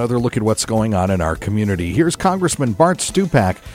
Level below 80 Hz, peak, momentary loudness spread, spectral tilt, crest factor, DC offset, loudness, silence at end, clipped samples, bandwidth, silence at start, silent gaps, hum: -38 dBFS; 0 dBFS; 4 LU; -5.5 dB/octave; 16 dB; under 0.1%; -17 LUFS; 0 s; under 0.1%; 16 kHz; 0 s; none; none